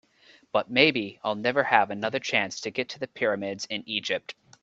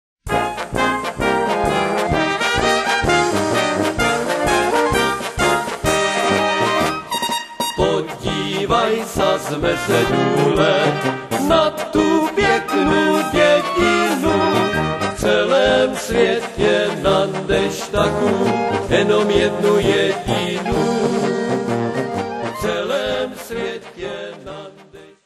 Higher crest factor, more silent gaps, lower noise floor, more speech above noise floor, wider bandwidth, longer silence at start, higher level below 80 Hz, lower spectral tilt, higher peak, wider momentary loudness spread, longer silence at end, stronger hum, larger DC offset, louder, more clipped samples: first, 26 dB vs 16 dB; neither; first, -58 dBFS vs -42 dBFS; first, 32 dB vs 26 dB; second, 8 kHz vs 13 kHz; first, 0.55 s vs 0.25 s; second, -68 dBFS vs -38 dBFS; about the same, -3.5 dB/octave vs -4.5 dB/octave; about the same, -2 dBFS vs -2 dBFS; first, 11 LU vs 7 LU; about the same, 0.3 s vs 0.2 s; neither; neither; second, -26 LUFS vs -17 LUFS; neither